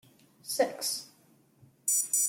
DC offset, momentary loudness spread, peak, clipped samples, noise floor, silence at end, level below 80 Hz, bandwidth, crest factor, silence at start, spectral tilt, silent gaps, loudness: under 0.1%; 10 LU; -14 dBFS; under 0.1%; -64 dBFS; 0 s; -86 dBFS; 17 kHz; 20 dB; 0.45 s; 0 dB/octave; none; -30 LUFS